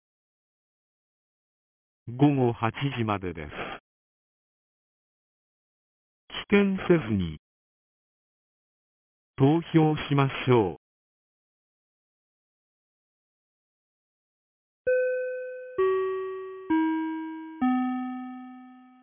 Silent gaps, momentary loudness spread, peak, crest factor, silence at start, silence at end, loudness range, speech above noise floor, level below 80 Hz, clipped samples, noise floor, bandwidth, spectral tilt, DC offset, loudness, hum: 3.80-6.28 s, 7.39-9.34 s, 10.77-14.85 s; 15 LU; -8 dBFS; 22 dB; 2.05 s; 0.25 s; 8 LU; 25 dB; -56 dBFS; under 0.1%; -49 dBFS; 3.6 kHz; -6.5 dB/octave; under 0.1%; -26 LUFS; none